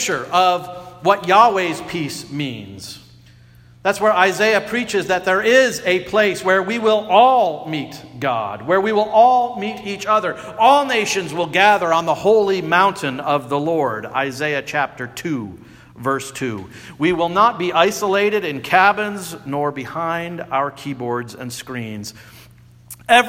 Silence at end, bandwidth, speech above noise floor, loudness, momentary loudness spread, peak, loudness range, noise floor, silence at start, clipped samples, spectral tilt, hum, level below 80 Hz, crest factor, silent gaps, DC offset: 0 s; 16.5 kHz; 29 dB; -17 LUFS; 14 LU; 0 dBFS; 7 LU; -46 dBFS; 0 s; under 0.1%; -4 dB/octave; none; -56 dBFS; 18 dB; none; under 0.1%